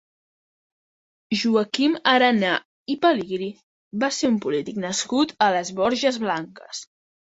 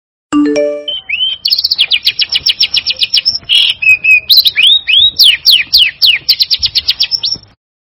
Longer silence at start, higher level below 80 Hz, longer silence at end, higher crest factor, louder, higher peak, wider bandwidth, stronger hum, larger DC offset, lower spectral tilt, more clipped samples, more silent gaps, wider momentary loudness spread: first, 1.3 s vs 0.3 s; second, -66 dBFS vs -46 dBFS; about the same, 0.5 s vs 0.5 s; first, 20 dB vs 10 dB; second, -22 LUFS vs -7 LUFS; about the same, -2 dBFS vs 0 dBFS; second, 8 kHz vs over 20 kHz; neither; neither; first, -3.5 dB/octave vs -1 dB/octave; second, under 0.1% vs 2%; first, 2.65-2.86 s, 3.63-3.91 s vs none; first, 14 LU vs 9 LU